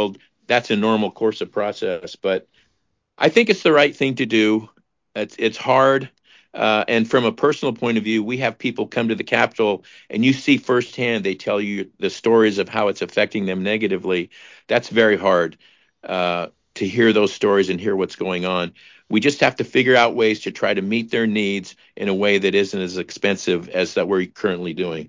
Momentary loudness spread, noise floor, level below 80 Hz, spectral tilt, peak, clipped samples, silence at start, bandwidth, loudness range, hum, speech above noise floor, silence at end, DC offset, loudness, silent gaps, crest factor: 10 LU; -70 dBFS; -60 dBFS; -5 dB/octave; -2 dBFS; under 0.1%; 0 s; 7.6 kHz; 2 LU; none; 51 dB; 0 s; under 0.1%; -19 LUFS; none; 18 dB